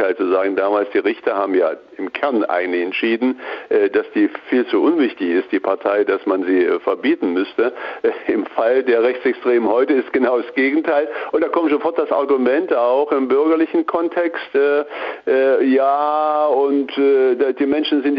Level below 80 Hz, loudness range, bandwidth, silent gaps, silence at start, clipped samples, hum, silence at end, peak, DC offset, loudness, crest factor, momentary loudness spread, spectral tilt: -64 dBFS; 2 LU; 5.2 kHz; none; 0 s; under 0.1%; none; 0 s; -4 dBFS; under 0.1%; -18 LUFS; 12 dB; 5 LU; -7.5 dB/octave